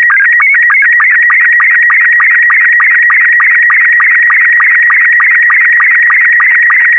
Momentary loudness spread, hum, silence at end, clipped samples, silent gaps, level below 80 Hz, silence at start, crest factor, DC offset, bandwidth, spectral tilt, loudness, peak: 0 LU; none; 0 s; under 0.1%; none; under -90 dBFS; 0 s; 4 dB; under 0.1%; 9.6 kHz; 4.5 dB/octave; -3 LUFS; -2 dBFS